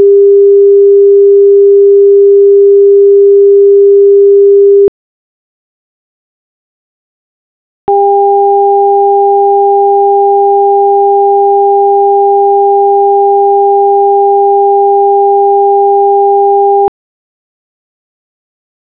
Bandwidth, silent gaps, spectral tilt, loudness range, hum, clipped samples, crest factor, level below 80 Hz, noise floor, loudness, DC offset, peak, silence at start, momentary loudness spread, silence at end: 1.3 kHz; 4.88-7.88 s; -10.5 dB/octave; 7 LU; none; 1%; 6 dB; -58 dBFS; under -90 dBFS; -6 LUFS; 0.4%; 0 dBFS; 0 s; 3 LU; 2 s